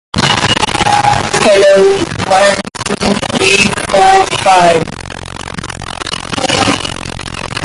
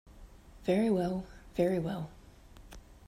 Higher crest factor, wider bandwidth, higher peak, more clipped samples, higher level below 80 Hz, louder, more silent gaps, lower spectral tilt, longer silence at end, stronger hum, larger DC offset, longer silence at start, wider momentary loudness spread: second, 12 dB vs 18 dB; second, 11.5 kHz vs 14.5 kHz; first, 0 dBFS vs -16 dBFS; neither; first, -34 dBFS vs -54 dBFS; first, -10 LUFS vs -33 LUFS; neither; second, -3.5 dB/octave vs -7.5 dB/octave; second, 0 s vs 0.15 s; neither; neither; about the same, 0.15 s vs 0.05 s; second, 15 LU vs 25 LU